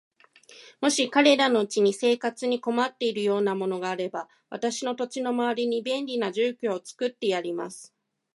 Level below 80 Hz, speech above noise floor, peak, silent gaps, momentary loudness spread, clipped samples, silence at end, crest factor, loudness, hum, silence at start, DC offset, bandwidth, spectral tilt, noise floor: -80 dBFS; 28 dB; -6 dBFS; none; 11 LU; under 0.1%; 0.5 s; 22 dB; -26 LUFS; none; 0.5 s; under 0.1%; 11.5 kHz; -3.5 dB/octave; -53 dBFS